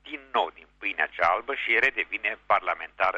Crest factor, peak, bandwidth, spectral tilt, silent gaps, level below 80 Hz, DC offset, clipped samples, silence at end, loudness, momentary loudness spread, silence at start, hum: 22 dB; -6 dBFS; 8.4 kHz; -3.5 dB/octave; none; -60 dBFS; under 0.1%; under 0.1%; 0 s; -26 LUFS; 9 LU; 0.05 s; 50 Hz at -65 dBFS